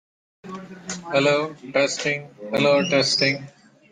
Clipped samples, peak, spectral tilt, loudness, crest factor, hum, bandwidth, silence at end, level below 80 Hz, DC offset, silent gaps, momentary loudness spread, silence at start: under 0.1%; -6 dBFS; -3.5 dB/octave; -21 LUFS; 18 dB; none; 9.8 kHz; 0.45 s; -66 dBFS; under 0.1%; none; 17 LU; 0.45 s